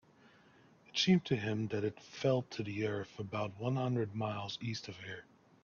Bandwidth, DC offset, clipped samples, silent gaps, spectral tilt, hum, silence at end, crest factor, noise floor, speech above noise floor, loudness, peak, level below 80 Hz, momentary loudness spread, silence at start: 7.2 kHz; under 0.1%; under 0.1%; none; -6 dB/octave; none; 0.4 s; 20 dB; -64 dBFS; 28 dB; -36 LUFS; -18 dBFS; -72 dBFS; 12 LU; 0.95 s